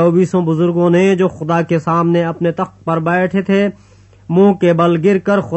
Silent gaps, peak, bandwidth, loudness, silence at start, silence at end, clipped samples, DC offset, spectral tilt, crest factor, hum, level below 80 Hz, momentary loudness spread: none; 0 dBFS; 8.4 kHz; -14 LUFS; 0 s; 0 s; under 0.1%; under 0.1%; -8 dB/octave; 12 dB; none; -54 dBFS; 6 LU